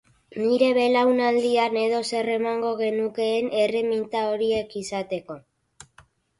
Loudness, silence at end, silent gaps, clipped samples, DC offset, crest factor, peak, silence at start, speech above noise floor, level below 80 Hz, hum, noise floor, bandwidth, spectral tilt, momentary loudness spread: -23 LUFS; 1 s; none; under 0.1%; under 0.1%; 16 dB; -8 dBFS; 0.35 s; 34 dB; -64 dBFS; none; -57 dBFS; 11.5 kHz; -4.5 dB/octave; 11 LU